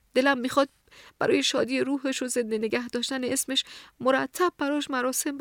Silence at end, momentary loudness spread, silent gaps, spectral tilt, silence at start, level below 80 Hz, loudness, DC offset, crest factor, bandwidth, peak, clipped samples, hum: 0 s; 5 LU; none; -2.5 dB/octave; 0.15 s; -68 dBFS; -26 LUFS; under 0.1%; 18 dB; 19.5 kHz; -8 dBFS; under 0.1%; none